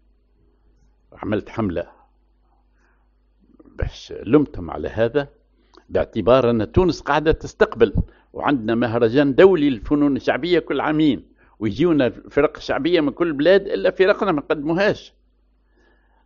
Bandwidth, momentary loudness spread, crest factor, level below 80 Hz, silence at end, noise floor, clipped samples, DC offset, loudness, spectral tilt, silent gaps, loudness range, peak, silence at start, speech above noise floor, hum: 7.2 kHz; 13 LU; 20 dB; -38 dBFS; 1.25 s; -60 dBFS; under 0.1%; under 0.1%; -19 LUFS; -5 dB/octave; none; 11 LU; 0 dBFS; 1.2 s; 41 dB; none